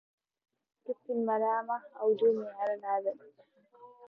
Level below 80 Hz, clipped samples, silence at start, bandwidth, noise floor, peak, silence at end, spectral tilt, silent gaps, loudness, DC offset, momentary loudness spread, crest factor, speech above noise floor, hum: under -90 dBFS; under 0.1%; 0.9 s; 4 kHz; -57 dBFS; -18 dBFS; 0.05 s; -8 dB/octave; none; -32 LUFS; under 0.1%; 14 LU; 16 dB; 25 dB; none